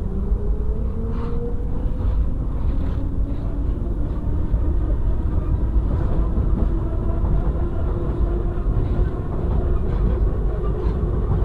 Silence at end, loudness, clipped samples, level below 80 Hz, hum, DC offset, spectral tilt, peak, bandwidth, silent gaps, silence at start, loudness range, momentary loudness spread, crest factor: 0 s; -24 LUFS; under 0.1%; -22 dBFS; none; 0.3%; -10.5 dB/octave; -6 dBFS; 4 kHz; none; 0 s; 2 LU; 4 LU; 12 dB